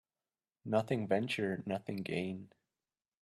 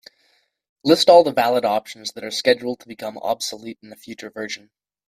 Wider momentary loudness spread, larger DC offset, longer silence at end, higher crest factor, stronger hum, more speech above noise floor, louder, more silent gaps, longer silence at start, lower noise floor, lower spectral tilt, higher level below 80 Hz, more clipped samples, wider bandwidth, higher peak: second, 9 LU vs 23 LU; neither; first, 0.75 s vs 0.5 s; about the same, 20 dB vs 20 dB; neither; first, over 54 dB vs 44 dB; second, -36 LUFS vs -19 LUFS; neither; second, 0.65 s vs 0.85 s; first, under -90 dBFS vs -64 dBFS; first, -6.5 dB/octave vs -3.5 dB/octave; second, -76 dBFS vs -66 dBFS; neither; second, 13 kHz vs 15.5 kHz; second, -18 dBFS vs 0 dBFS